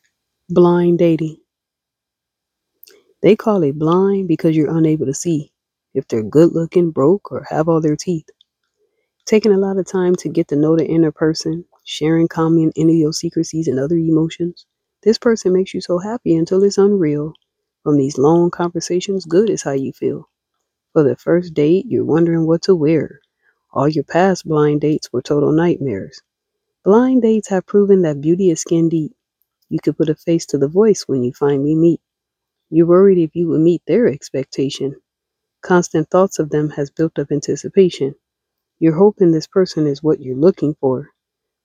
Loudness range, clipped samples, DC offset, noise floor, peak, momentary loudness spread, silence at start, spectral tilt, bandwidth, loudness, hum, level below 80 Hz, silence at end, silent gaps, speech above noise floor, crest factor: 3 LU; under 0.1%; under 0.1%; -83 dBFS; 0 dBFS; 9 LU; 0.5 s; -7 dB/octave; 10.5 kHz; -16 LUFS; none; -56 dBFS; 0.6 s; none; 68 dB; 16 dB